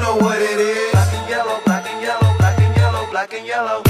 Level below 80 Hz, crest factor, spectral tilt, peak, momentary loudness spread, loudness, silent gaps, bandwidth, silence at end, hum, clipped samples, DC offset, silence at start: -38 dBFS; 14 dB; -6 dB/octave; -2 dBFS; 7 LU; -17 LUFS; none; 14 kHz; 0 s; none; under 0.1%; under 0.1%; 0 s